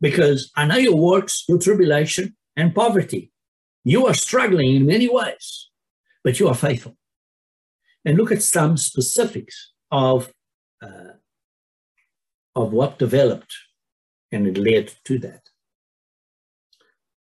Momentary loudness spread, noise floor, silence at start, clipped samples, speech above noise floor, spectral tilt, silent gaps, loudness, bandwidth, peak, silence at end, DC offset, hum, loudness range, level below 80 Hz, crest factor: 14 LU; under -90 dBFS; 0 s; under 0.1%; over 72 dB; -5 dB/octave; 3.48-3.83 s, 5.90-6.04 s, 7.16-7.79 s, 10.54-10.78 s, 11.44-11.95 s, 12.34-12.53 s, 13.92-14.29 s; -19 LUFS; 13 kHz; -4 dBFS; 1.95 s; under 0.1%; none; 7 LU; -62 dBFS; 16 dB